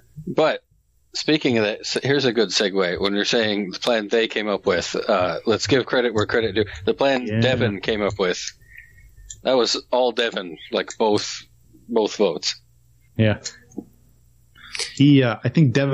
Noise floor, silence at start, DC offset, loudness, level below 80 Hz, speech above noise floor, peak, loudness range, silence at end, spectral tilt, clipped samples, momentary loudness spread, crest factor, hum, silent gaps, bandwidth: -57 dBFS; 0.15 s; under 0.1%; -21 LUFS; -52 dBFS; 36 dB; -6 dBFS; 3 LU; 0 s; -5 dB/octave; under 0.1%; 10 LU; 16 dB; none; none; 11.5 kHz